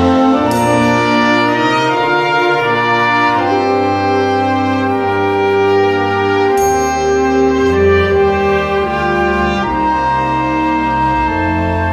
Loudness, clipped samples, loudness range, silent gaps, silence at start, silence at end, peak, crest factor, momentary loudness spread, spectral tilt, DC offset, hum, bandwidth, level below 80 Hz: -13 LUFS; under 0.1%; 2 LU; none; 0 s; 0 s; 0 dBFS; 12 dB; 3 LU; -5.5 dB/octave; under 0.1%; none; 13.5 kHz; -34 dBFS